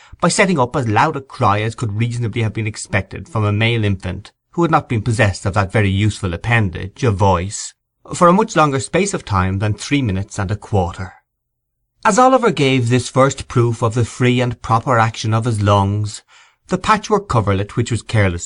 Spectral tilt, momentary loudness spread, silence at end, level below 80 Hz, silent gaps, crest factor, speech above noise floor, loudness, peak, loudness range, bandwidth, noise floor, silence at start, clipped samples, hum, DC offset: -5.5 dB/octave; 9 LU; 0 s; -42 dBFS; none; 16 dB; 58 dB; -17 LUFS; -2 dBFS; 3 LU; 11 kHz; -74 dBFS; 0.2 s; under 0.1%; none; under 0.1%